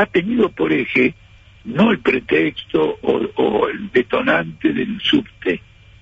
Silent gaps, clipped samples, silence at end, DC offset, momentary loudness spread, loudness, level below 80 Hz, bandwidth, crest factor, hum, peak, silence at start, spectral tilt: none; under 0.1%; 0.4 s; under 0.1%; 6 LU; -18 LUFS; -48 dBFS; 7.8 kHz; 14 dB; none; -4 dBFS; 0 s; -7 dB/octave